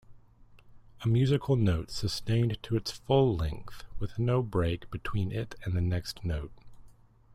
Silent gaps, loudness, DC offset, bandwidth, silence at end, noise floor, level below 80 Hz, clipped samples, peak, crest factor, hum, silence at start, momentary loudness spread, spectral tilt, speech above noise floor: none; -30 LUFS; under 0.1%; 14.5 kHz; 0.4 s; -56 dBFS; -46 dBFS; under 0.1%; -12 dBFS; 18 dB; none; 0.1 s; 11 LU; -7 dB/octave; 27 dB